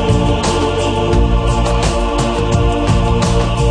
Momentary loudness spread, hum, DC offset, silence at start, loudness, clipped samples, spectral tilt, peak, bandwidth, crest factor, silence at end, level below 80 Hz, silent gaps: 2 LU; none; under 0.1%; 0 s; -15 LUFS; under 0.1%; -6 dB/octave; -2 dBFS; 10 kHz; 12 dB; 0 s; -18 dBFS; none